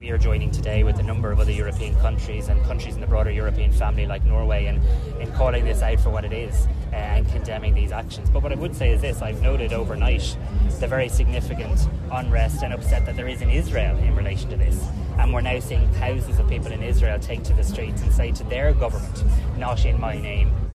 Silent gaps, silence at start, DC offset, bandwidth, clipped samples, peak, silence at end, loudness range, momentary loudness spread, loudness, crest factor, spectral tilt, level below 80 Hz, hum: none; 0 s; under 0.1%; 12 kHz; under 0.1%; -8 dBFS; 0.05 s; 1 LU; 4 LU; -23 LUFS; 12 dB; -6.5 dB/octave; -22 dBFS; none